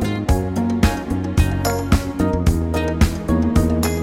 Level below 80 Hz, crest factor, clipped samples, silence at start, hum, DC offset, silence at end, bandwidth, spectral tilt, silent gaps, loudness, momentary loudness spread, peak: -24 dBFS; 14 dB; under 0.1%; 0 s; none; 0.1%; 0 s; 16.5 kHz; -6.5 dB/octave; none; -19 LUFS; 3 LU; -2 dBFS